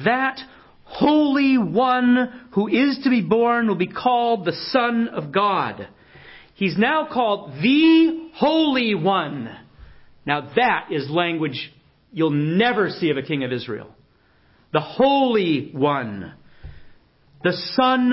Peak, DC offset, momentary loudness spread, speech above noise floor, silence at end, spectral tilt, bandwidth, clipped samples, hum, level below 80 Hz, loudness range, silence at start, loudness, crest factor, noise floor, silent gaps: -2 dBFS; under 0.1%; 12 LU; 38 dB; 0 s; -10 dB/octave; 5.8 kHz; under 0.1%; none; -56 dBFS; 4 LU; 0 s; -20 LUFS; 18 dB; -57 dBFS; none